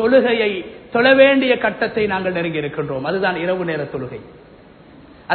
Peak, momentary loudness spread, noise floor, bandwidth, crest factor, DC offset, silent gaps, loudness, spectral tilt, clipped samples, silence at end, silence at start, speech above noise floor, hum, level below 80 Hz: 0 dBFS; 15 LU; -44 dBFS; 4.5 kHz; 18 dB; under 0.1%; none; -17 LUFS; -10.5 dB/octave; under 0.1%; 0 s; 0 s; 27 dB; none; -52 dBFS